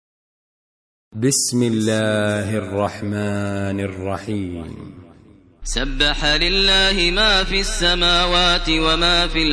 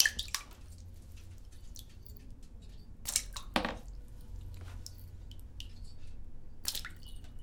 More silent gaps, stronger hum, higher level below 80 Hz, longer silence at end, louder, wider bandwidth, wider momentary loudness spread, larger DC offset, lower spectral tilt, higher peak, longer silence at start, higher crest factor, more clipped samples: neither; neither; first, -28 dBFS vs -48 dBFS; about the same, 0 s vs 0 s; first, -17 LUFS vs -38 LUFS; second, 11 kHz vs 18 kHz; second, 12 LU vs 20 LU; neither; about the same, -3 dB/octave vs -2 dB/octave; about the same, -4 dBFS vs -4 dBFS; first, 1.15 s vs 0 s; second, 16 dB vs 36 dB; neither